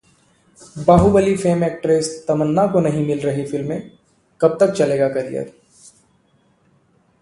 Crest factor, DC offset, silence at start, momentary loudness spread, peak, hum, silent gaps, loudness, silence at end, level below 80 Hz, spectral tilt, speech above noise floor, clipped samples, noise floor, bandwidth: 18 dB; under 0.1%; 0.6 s; 13 LU; 0 dBFS; none; none; -18 LUFS; 1.7 s; -40 dBFS; -7 dB/octave; 42 dB; under 0.1%; -59 dBFS; 11.5 kHz